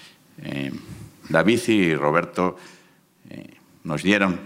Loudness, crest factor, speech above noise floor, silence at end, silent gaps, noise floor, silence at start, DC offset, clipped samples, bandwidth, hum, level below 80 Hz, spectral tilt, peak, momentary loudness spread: -22 LUFS; 22 dB; 34 dB; 0 s; none; -54 dBFS; 0.05 s; under 0.1%; under 0.1%; 16 kHz; none; -60 dBFS; -5.5 dB/octave; -2 dBFS; 23 LU